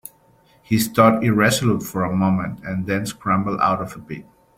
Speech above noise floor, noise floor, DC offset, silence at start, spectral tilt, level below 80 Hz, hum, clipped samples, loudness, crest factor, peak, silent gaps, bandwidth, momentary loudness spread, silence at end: 36 dB; -55 dBFS; under 0.1%; 0.7 s; -5.5 dB/octave; -52 dBFS; none; under 0.1%; -19 LUFS; 18 dB; -2 dBFS; none; 16.5 kHz; 13 LU; 0.35 s